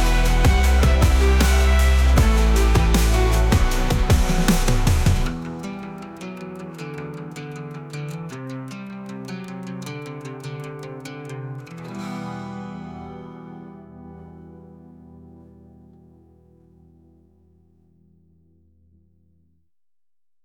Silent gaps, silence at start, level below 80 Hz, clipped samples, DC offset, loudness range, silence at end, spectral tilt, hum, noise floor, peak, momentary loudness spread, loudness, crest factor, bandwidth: none; 0 s; -22 dBFS; under 0.1%; under 0.1%; 20 LU; 5.3 s; -5.5 dB/octave; none; under -90 dBFS; -6 dBFS; 20 LU; -21 LUFS; 16 dB; 18 kHz